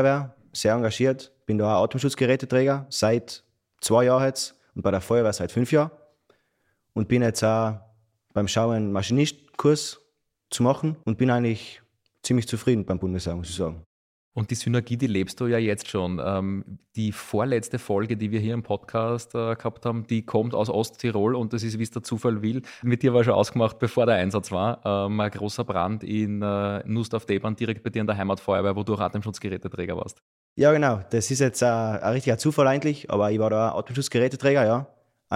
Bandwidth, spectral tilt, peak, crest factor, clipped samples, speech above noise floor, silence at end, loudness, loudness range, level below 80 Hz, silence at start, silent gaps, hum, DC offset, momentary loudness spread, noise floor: 15.5 kHz; -6 dB/octave; -6 dBFS; 18 dB; under 0.1%; 48 dB; 0 s; -25 LUFS; 4 LU; -56 dBFS; 0 s; 13.86-14.32 s, 30.22-30.56 s; none; under 0.1%; 10 LU; -72 dBFS